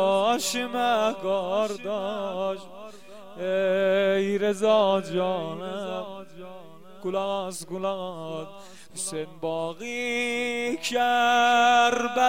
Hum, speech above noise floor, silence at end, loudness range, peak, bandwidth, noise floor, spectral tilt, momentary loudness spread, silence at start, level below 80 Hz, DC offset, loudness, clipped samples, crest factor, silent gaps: none; 21 dB; 0 s; 8 LU; -8 dBFS; 16.5 kHz; -47 dBFS; -3.5 dB/octave; 17 LU; 0 s; -66 dBFS; 0.4%; -25 LUFS; under 0.1%; 18 dB; none